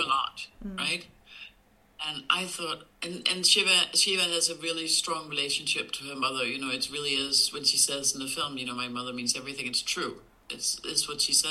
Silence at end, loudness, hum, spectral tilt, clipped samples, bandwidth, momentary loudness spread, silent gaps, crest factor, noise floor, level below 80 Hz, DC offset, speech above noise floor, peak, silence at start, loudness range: 0 s; -27 LUFS; none; -0.5 dB/octave; under 0.1%; 16 kHz; 13 LU; none; 22 dB; -61 dBFS; -62 dBFS; under 0.1%; 32 dB; -8 dBFS; 0 s; 5 LU